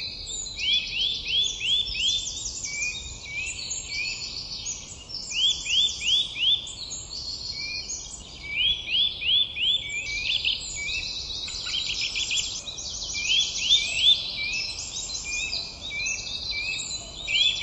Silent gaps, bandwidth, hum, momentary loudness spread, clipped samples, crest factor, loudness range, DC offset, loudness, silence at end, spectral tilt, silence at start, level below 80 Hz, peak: none; 12 kHz; none; 11 LU; under 0.1%; 20 dB; 4 LU; under 0.1%; -25 LUFS; 0 s; 1 dB/octave; 0 s; -48 dBFS; -8 dBFS